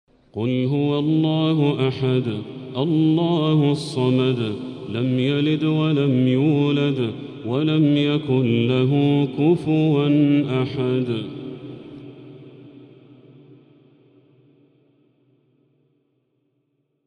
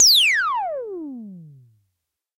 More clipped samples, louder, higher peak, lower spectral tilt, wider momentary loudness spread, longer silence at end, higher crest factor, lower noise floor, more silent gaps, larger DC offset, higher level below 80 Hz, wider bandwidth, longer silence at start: neither; second, -20 LUFS vs -17 LUFS; second, -8 dBFS vs -4 dBFS; first, -8.5 dB/octave vs 1 dB/octave; second, 13 LU vs 24 LU; first, 4.2 s vs 0.9 s; about the same, 14 dB vs 16 dB; second, -70 dBFS vs -78 dBFS; neither; neither; about the same, -62 dBFS vs -62 dBFS; second, 10 kHz vs 16 kHz; first, 0.35 s vs 0 s